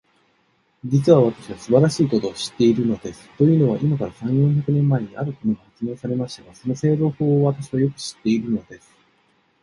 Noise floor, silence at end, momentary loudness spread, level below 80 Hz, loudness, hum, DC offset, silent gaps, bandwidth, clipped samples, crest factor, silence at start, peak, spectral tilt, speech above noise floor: -64 dBFS; 0.85 s; 12 LU; -56 dBFS; -20 LUFS; none; under 0.1%; none; 11.5 kHz; under 0.1%; 18 dB; 0.85 s; -2 dBFS; -7.5 dB/octave; 44 dB